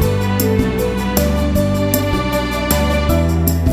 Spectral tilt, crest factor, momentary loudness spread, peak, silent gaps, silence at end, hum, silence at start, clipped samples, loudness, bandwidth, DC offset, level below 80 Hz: -6 dB/octave; 16 dB; 2 LU; 0 dBFS; none; 0 s; none; 0 s; under 0.1%; -16 LUFS; 16 kHz; under 0.1%; -22 dBFS